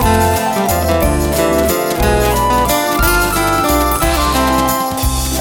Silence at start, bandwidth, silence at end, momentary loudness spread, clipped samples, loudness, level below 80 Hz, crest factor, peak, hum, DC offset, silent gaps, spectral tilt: 0 s; 19 kHz; 0 s; 2 LU; under 0.1%; -13 LUFS; -22 dBFS; 12 dB; 0 dBFS; none; 0.2%; none; -4.5 dB/octave